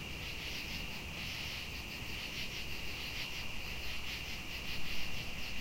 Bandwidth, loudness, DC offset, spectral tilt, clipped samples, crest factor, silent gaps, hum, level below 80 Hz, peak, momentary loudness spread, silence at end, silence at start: 16 kHz; -41 LUFS; under 0.1%; -2.5 dB/octave; under 0.1%; 16 dB; none; none; -50 dBFS; -24 dBFS; 2 LU; 0 s; 0 s